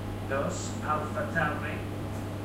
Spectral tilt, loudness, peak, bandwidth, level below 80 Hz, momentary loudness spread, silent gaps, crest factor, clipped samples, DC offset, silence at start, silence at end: -5.5 dB/octave; -32 LUFS; -16 dBFS; 16 kHz; -48 dBFS; 7 LU; none; 16 dB; under 0.1%; under 0.1%; 0 s; 0 s